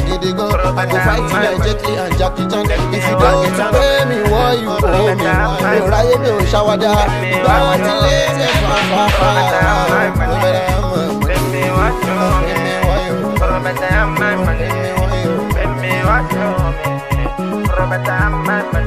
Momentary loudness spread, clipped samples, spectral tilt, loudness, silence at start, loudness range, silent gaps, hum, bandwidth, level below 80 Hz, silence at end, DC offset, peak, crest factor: 5 LU; under 0.1%; -5.5 dB/octave; -14 LUFS; 0 s; 3 LU; none; none; 15.5 kHz; -22 dBFS; 0 s; under 0.1%; 0 dBFS; 14 dB